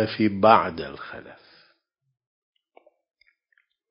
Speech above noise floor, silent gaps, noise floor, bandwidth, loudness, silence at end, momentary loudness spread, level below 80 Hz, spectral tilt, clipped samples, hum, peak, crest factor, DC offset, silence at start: 47 dB; none; -70 dBFS; 5.4 kHz; -21 LUFS; 2.55 s; 22 LU; -58 dBFS; -10 dB/octave; under 0.1%; none; -2 dBFS; 26 dB; under 0.1%; 0 s